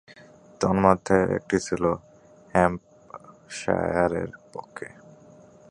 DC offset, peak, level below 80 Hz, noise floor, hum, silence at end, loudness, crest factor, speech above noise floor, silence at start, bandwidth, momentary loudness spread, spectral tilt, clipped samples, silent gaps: under 0.1%; -2 dBFS; -50 dBFS; -51 dBFS; none; 0.85 s; -24 LUFS; 24 dB; 27 dB; 0.6 s; 11 kHz; 21 LU; -6 dB/octave; under 0.1%; none